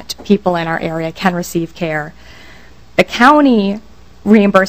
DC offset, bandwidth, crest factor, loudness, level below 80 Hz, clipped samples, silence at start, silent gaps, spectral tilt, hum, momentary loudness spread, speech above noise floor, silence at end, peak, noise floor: 1%; 16 kHz; 14 dB; -14 LUFS; -44 dBFS; 0.6%; 0 s; none; -6 dB/octave; none; 13 LU; 28 dB; 0 s; 0 dBFS; -41 dBFS